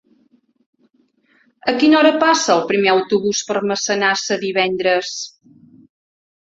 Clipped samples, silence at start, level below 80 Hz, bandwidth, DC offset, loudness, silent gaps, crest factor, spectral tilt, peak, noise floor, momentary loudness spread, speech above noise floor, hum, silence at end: under 0.1%; 1.65 s; -64 dBFS; 7.8 kHz; under 0.1%; -16 LUFS; none; 18 dB; -3 dB/octave; 0 dBFS; -60 dBFS; 10 LU; 44 dB; none; 1.25 s